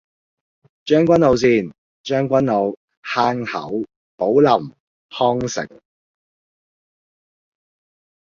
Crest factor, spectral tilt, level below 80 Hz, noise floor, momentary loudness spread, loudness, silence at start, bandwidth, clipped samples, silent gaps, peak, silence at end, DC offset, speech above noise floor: 18 dB; -6 dB/octave; -54 dBFS; under -90 dBFS; 20 LU; -18 LUFS; 0.85 s; 7.6 kHz; under 0.1%; 1.78-2.04 s, 2.77-2.88 s, 2.97-3.02 s, 3.96-4.18 s, 4.80-5.09 s; -2 dBFS; 2.6 s; under 0.1%; over 73 dB